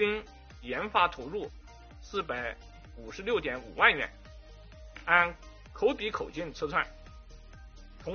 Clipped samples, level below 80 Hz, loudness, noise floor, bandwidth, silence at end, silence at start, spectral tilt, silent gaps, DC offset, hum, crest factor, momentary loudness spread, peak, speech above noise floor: under 0.1%; -50 dBFS; -30 LUFS; -50 dBFS; 6.8 kHz; 0 s; 0 s; -1.5 dB/octave; none; under 0.1%; none; 26 dB; 24 LU; -6 dBFS; 19 dB